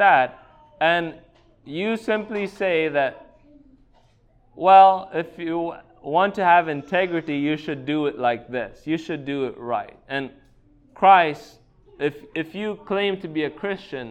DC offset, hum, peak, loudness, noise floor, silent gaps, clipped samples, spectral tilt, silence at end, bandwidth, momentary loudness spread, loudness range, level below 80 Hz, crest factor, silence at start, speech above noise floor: under 0.1%; none; -2 dBFS; -22 LUFS; -57 dBFS; none; under 0.1%; -6.5 dB/octave; 0 s; 8.8 kHz; 15 LU; 7 LU; -60 dBFS; 20 dB; 0 s; 36 dB